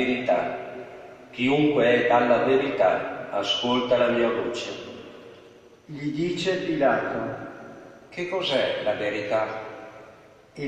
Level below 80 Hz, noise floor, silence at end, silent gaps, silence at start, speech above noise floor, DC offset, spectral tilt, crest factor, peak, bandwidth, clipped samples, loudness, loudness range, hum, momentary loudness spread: -62 dBFS; -50 dBFS; 0 s; none; 0 s; 27 dB; under 0.1%; -5 dB/octave; 18 dB; -8 dBFS; 9.4 kHz; under 0.1%; -24 LUFS; 7 LU; none; 20 LU